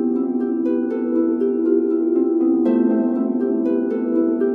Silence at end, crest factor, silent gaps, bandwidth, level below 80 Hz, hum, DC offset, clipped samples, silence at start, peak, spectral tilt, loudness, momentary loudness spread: 0 s; 12 dB; none; 3.3 kHz; -78 dBFS; none; under 0.1%; under 0.1%; 0 s; -6 dBFS; -10.5 dB/octave; -19 LUFS; 4 LU